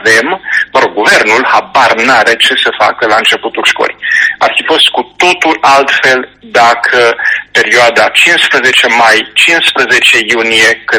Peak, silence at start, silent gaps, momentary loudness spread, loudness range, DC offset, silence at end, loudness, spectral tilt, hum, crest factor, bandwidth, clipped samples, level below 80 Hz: 0 dBFS; 0 s; none; 5 LU; 2 LU; under 0.1%; 0 s; -6 LUFS; -1.5 dB/octave; none; 8 dB; over 20 kHz; 0.9%; -50 dBFS